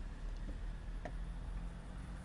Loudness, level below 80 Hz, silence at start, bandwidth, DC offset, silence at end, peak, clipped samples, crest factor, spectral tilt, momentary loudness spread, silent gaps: -48 LUFS; -44 dBFS; 0 s; 11 kHz; under 0.1%; 0 s; -32 dBFS; under 0.1%; 12 dB; -6.5 dB/octave; 2 LU; none